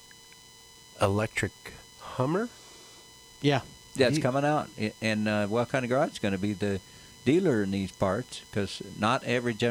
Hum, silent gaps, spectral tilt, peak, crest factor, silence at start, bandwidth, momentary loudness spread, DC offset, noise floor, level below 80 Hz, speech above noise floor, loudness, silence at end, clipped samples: none; none; -5.5 dB/octave; -10 dBFS; 20 dB; 0.95 s; 16.5 kHz; 20 LU; under 0.1%; -52 dBFS; -60 dBFS; 25 dB; -29 LUFS; 0 s; under 0.1%